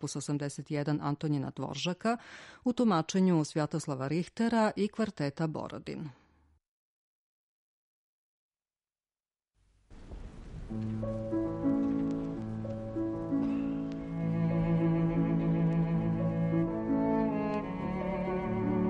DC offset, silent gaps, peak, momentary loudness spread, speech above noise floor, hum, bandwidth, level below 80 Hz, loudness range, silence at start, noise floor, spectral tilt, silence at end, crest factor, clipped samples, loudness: under 0.1%; 6.68-8.51 s; -18 dBFS; 10 LU; over 58 dB; none; 11 kHz; -52 dBFS; 11 LU; 0 s; under -90 dBFS; -7 dB/octave; 0 s; 14 dB; under 0.1%; -32 LUFS